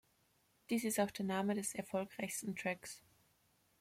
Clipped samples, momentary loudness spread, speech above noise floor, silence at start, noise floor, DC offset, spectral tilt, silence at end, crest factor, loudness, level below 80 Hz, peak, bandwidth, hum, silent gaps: under 0.1%; 7 LU; 36 dB; 0.7 s; -76 dBFS; under 0.1%; -4 dB/octave; 0.8 s; 20 dB; -40 LUFS; -80 dBFS; -22 dBFS; 16.5 kHz; none; none